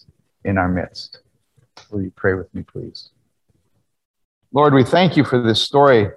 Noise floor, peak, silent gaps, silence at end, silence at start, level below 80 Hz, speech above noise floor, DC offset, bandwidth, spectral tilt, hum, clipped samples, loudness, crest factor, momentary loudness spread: -68 dBFS; -2 dBFS; 4.05-4.14 s, 4.25-4.41 s; 0.05 s; 0.45 s; -50 dBFS; 51 dB; under 0.1%; 12 kHz; -6.5 dB/octave; none; under 0.1%; -17 LUFS; 18 dB; 20 LU